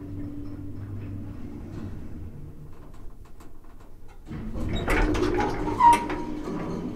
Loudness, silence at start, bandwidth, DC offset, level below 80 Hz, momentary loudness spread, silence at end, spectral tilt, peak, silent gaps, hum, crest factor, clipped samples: -27 LUFS; 0 s; 15.5 kHz; under 0.1%; -36 dBFS; 25 LU; 0 s; -6 dB/octave; -6 dBFS; none; none; 22 dB; under 0.1%